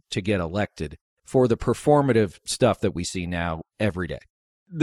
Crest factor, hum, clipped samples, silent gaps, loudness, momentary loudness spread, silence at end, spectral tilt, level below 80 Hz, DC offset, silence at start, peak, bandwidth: 18 dB; none; under 0.1%; 1.01-1.17 s, 4.30-4.66 s; -24 LUFS; 13 LU; 0 s; -6 dB/octave; -46 dBFS; under 0.1%; 0.1 s; -6 dBFS; 14 kHz